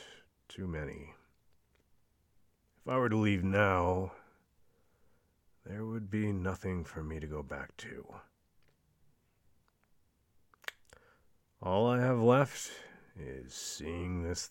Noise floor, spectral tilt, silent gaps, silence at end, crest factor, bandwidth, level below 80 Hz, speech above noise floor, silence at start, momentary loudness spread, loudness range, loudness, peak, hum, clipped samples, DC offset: -72 dBFS; -6 dB/octave; none; 0 s; 24 dB; 17 kHz; -58 dBFS; 39 dB; 0 s; 19 LU; 18 LU; -34 LUFS; -12 dBFS; none; under 0.1%; under 0.1%